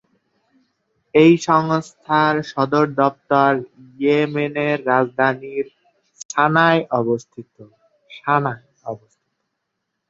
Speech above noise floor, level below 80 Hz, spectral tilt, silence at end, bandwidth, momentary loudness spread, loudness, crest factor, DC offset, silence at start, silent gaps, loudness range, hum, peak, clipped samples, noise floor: 59 dB; -64 dBFS; -6 dB/octave; 1.15 s; 7.8 kHz; 14 LU; -18 LUFS; 18 dB; under 0.1%; 1.15 s; 6.25-6.29 s; 4 LU; none; -2 dBFS; under 0.1%; -77 dBFS